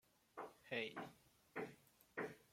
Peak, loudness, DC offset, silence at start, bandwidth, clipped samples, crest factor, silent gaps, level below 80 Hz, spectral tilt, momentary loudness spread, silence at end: -30 dBFS; -51 LUFS; under 0.1%; 0.35 s; 16.5 kHz; under 0.1%; 22 dB; none; -86 dBFS; -4.5 dB/octave; 12 LU; 0.05 s